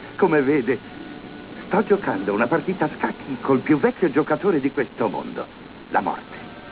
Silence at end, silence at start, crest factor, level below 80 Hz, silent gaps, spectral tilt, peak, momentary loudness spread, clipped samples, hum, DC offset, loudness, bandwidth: 0 s; 0 s; 16 dB; -56 dBFS; none; -11 dB/octave; -6 dBFS; 18 LU; under 0.1%; none; under 0.1%; -22 LUFS; 4 kHz